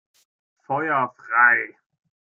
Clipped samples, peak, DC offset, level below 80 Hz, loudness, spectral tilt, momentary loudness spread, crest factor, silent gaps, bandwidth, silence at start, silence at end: under 0.1%; -4 dBFS; under 0.1%; -76 dBFS; -20 LUFS; -7 dB/octave; 12 LU; 20 dB; none; 7 kHz; 0.7 s; 0.75 s